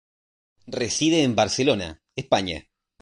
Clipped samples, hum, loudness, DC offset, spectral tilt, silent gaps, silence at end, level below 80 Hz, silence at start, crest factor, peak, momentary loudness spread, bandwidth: under 0.1%; none; -23 LUFS; under 0.1%; -4 dB/octave; none; 0.4 s; -50 dBFS; 0.65 s; 20 dB; -4 dBFS; 15 LU; 11.5 kHz